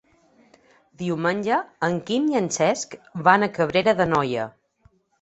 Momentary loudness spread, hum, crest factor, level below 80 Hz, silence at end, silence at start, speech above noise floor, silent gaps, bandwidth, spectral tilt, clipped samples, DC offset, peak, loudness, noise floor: 11 LU; none; 22 dB; -60 dBFS; 0.7 s; 1 s; 39 dB; none; 8.2 kHz; -4.5 dB/octave; under 0.1%; under 0.1%; -2 dBFS; -22 LUFS; -61 dBFS